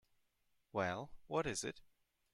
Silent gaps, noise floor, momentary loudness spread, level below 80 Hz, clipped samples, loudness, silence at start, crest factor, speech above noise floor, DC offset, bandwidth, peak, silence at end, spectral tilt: none; -80 dBFS; 8 LU; -68 dBFS; under 0.1%; -42 LUFS; 0.75 s; 20 dB; 38 dB; under 0.1%; 15 kHz; -24 dBFS; 0.5 s; -4 dB/octave